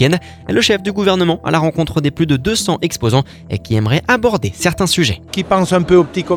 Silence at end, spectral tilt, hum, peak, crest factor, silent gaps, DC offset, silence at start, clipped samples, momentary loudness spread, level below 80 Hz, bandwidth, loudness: 0 s; -5 dB/octave; none; 0 dBFS; 14 dB; none; under 0.1%; 0 s; under 0.1%; 5 LU; -38 dBFS; 18 kHz; -15 LUFS